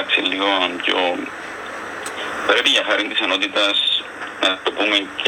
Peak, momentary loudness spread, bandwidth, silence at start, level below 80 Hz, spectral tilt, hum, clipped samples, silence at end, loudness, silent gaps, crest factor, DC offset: -2 dBFS; 14 LU; over 20 kHz; 0 s; -62 dBFS; -1.5 dB/octave; none; under 0.1%; 0 s; -18 LUFS; none; 18 dB; under 0.1%